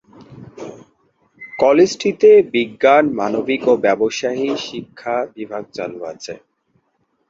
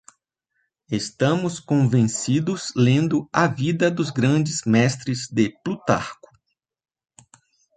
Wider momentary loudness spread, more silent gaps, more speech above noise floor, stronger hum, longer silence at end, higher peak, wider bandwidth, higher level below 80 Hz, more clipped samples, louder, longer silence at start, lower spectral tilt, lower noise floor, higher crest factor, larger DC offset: first, 21 LU vs 8 LU; neither; second, 50 dB vs 54 dB; neither; second, 0.95 s vs 1.65 s; about the same, -2 dBFS vs -2 dBFS; second, 7.6 kHz vs 9.4 kHz; about the same, -60 dBFS vs -58 dBFS; neither; first, -16 LUFS vs -21 LUFS; second, 0.2 s vs 0.9 s; about the same, -4.5 dB/octave vs -5.5 dB/octave; second, -66 dBFS vs -75 dBFS; about the same, 16 dB vs 20 dB; neither